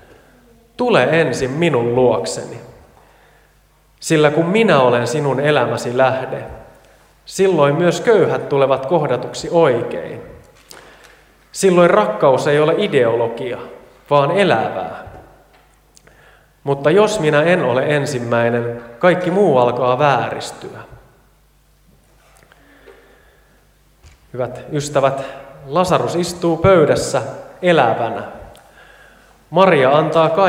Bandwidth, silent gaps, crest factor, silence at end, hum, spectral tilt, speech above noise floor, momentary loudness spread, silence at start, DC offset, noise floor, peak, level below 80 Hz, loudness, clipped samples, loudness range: 16 kHz; none; 16 dB; 0 s; none; -5.5 dB/octave; 38 dB; 16 LU; 0.8 s; under 0.1%; -53 dBFS; 0 dBFS; -50 dBFS; -15 LUFS; under 0.1%; 6 LU